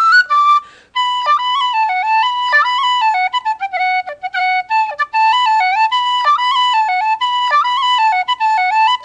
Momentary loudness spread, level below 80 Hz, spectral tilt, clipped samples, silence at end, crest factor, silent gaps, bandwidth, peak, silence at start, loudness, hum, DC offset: 5 LU; -64 dBFS; 2 dB/octave; under 0.1%; 0 s; 12 dB; none; 9.4 kHz; -2 dBFS; 0 s; -14 LUFS; none; under 0.1%